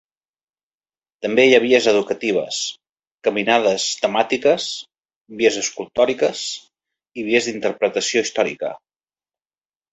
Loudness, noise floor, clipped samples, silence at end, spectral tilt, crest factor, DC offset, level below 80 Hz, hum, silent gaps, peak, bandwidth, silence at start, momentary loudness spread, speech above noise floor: -19 LUFS; under -90 dBFS; under 0.1%; 1.15 s; -2.5 dB/octave; 20 dB; under 0.1%; -64 dBFS; none; 2.92-2.96 s, 3.07-3.18 s, 5.16-5.25 s; -2 dBFS; 8.2 kHz; 1.2 s; 14 LU; over 71 dB